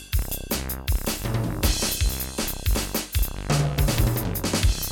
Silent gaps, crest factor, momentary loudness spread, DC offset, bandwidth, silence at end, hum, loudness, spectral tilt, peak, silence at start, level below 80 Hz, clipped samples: none; 16 dB; 5 LU; under 0.1%; over 20 kHz; 0 s; none; -25 LUFS; -4 dB/octave; -8 dBFS; 0 s; -28 dBFS; under 0.1%